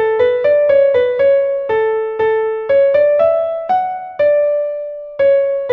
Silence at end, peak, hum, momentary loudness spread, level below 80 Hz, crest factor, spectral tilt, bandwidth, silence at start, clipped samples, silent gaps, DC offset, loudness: 0 s; -2 dBFS; none; 6 LU; -54 dBFS; 12 dB; -6 dB/octave; 4.5 kHz; 0 s; under 0.1%; none; under 0.1%; -14 LUFS